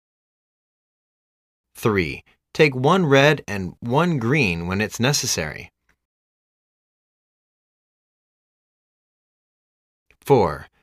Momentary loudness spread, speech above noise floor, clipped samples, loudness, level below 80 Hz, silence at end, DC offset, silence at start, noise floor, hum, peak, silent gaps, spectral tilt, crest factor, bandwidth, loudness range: 14 LU; over 70 dB; under 0.1%; -20 LUFS; -52 dBFS; 0.2 s; under 0.1%; 1.75 s; under -90 dBFS; none; -2 dBFS; 6.05-10.06 s; -5 dB/octave; 20 dB; 15.5 kHz; 8 LU